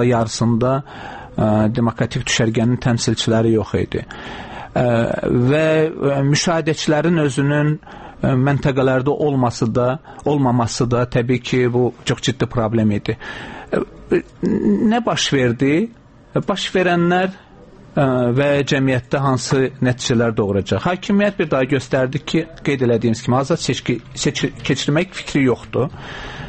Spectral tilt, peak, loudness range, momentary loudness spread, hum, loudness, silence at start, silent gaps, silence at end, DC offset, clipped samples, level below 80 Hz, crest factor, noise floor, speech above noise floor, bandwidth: -5.5 dB/octave; -4 dBFS; 2 LU; 7 LU; none; -18 LUFS; 0 s; none; 0 s; under 0.1%; under 0.1%; -44 dBFS; 12 dB; -42 dBFS; 25 dB; 8.8 kHz